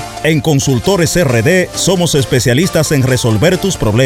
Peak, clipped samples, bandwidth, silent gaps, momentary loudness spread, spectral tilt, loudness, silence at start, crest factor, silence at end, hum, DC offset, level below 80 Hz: 0 dBFS; under 0.1%; 17 kHz; none; 2 LU; -5 dB/octave; -12 LUFS; 0 s; 12 dB; 0 s; none; under 0.1%; -32 dBFS